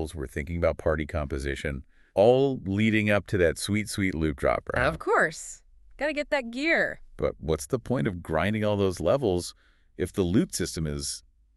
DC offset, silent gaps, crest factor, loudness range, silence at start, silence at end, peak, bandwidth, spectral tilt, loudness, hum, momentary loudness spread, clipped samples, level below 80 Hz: under 0.1%; none; 18 dB; 3 LU; 0 s; 0.35 s; -8 dBFS; 12 kHz; -5.5 dB/octave; -27 LUFS; none; 9 LU; under 0.1%; -42 dBFS